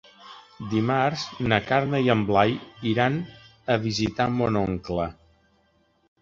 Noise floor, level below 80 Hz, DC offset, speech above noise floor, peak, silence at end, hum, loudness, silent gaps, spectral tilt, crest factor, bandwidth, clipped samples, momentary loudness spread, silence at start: -65 dBFS; -50 dBFS; under 0.1%; 41 dB; -4 dBFS; 1.1 s; none; -24 LUFS; none; -6.5 dB/octave; 22 dB; 7.6 kHz; under 0.1%; 12 LU; 0.25 s